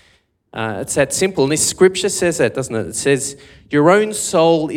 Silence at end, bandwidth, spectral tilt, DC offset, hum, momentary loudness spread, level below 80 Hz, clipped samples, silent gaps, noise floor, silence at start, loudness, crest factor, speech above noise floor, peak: 0 s; 17 kHz; -4 dB/octave; under 0.1%; none; 11 LU; -52 dBFS; under 0.1%; none; -57 dBFS; 0.55 s; -16 LUFS; 16 dB; 41 dB; 0 dBFS